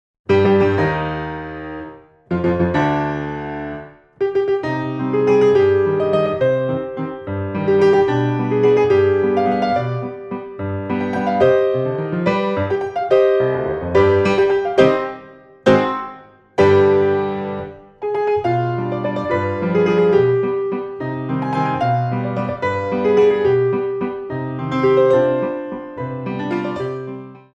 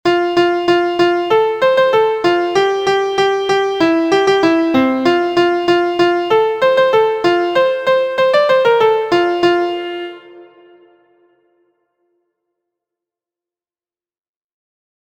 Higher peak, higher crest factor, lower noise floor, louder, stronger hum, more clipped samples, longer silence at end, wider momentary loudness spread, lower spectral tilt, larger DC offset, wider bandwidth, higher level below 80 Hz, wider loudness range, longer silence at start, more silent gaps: about the same, 0 dBFS vs 0 dBFS; about the same, 18 dB vs 14 dB; second, -41 dBFS vs under -90 dBFS; second, -18 LUFS vs -14 LUFS; neither; neither; second, 0.15 s vs 4.6 s; first, 13 LU vs 3 LU; first, -8 dB/octave vs -5 dB/octave; neither; second, 7.4 kHz vs 8.8 kHz; first, -48 dBFS vs -56 dBFS; second, 3 LU vs 6 LU; first, 0.3 s vs 0.05 s; neither